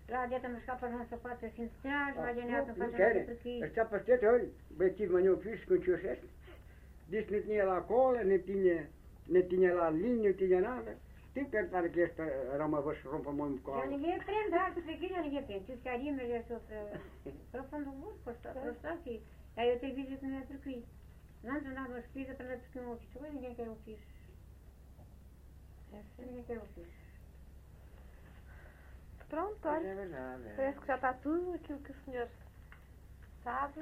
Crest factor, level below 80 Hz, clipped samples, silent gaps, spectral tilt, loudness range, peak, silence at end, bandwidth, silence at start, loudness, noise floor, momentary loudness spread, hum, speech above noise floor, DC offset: 20 dB; -56 dBFS; under 0.1%; none; -8 dB/octave; 18 LU; -18 dBFS; 0 s; 4.5 kHz; 0 s; -36 LUFS; -56 dBFS; 19 LU; none; 20 dB; under 0.1%